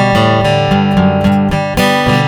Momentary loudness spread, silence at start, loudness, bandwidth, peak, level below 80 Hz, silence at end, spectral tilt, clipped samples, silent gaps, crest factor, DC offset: 2 LU; 0 s; -11 LUFS; 18.5 kHz; 0 dBFS; -30 dBFS; 0 s; -6 dB/octave; under 0.1%; none; 10 dB; under 0.1%